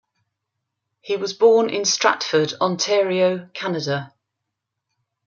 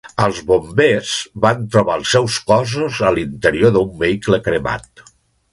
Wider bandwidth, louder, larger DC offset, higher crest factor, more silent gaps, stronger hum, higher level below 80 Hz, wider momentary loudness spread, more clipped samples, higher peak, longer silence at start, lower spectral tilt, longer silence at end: second, 7.4 kHz vs 11.5 kHz; second, -20 LUFS vs -16 LUFS; neither; about the same, 20 dB vs 16 dB; neither; neither; second, -72 dBFS vs -42 dBFS; first, 11 LU vs 5 LU; neither; about the same, -2 dBFS vs 0 dBFS; first, 1.05 s vs 0.05 s; second, -3.5 dB/octave vs -5 dB/octave; first, 1.2 s vs 0.5 s